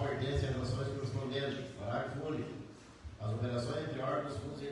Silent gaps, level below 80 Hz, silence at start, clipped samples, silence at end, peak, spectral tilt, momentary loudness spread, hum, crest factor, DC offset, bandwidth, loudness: none; -56 dBFS; 0 s; under 0.1%; 0 s; -22 dBFS; -6.5 dB/octave; 10 LU; none; 16 dB; under 0.1%; 11.5 kHz; -38 LUFS